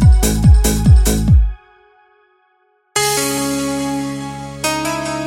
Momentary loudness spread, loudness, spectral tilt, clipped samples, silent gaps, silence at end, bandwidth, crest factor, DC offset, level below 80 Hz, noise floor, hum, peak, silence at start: 11 LU; -15 LUFS; -5 dB/octave; under 0.1%; none; 0 s; 16.5 kHz; 14 dB; under 0.1%; -18 dBFS; -59 dBFS; none; -2 dBFS; 0 s